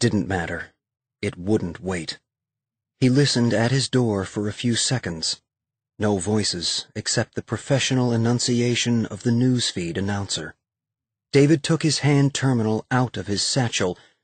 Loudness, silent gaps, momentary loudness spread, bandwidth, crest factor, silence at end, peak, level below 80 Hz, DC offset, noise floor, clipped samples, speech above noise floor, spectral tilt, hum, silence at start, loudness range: -22 LUFS; none; 10 LU; 9.2 kHz; 16 dB; 0.3 s; -6 dBFS; -54 dBFS; under 0.1%; -88 dBFS; under 0.1%; 66 dB; -4.5 dB/octave; none; 0 s; 3 LU